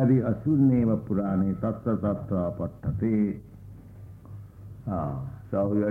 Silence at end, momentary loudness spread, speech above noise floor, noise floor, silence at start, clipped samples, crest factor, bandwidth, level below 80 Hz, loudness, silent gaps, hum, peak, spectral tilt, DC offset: 0 s; 23 LU; 20 dB; -45 dBFS; 0 s; under 0.1%; 14 dB; 3.3 kHz; -50 dBFS; -27 LUFS; none; none; -12 dBFS; -12 dB/octave; under 0.1%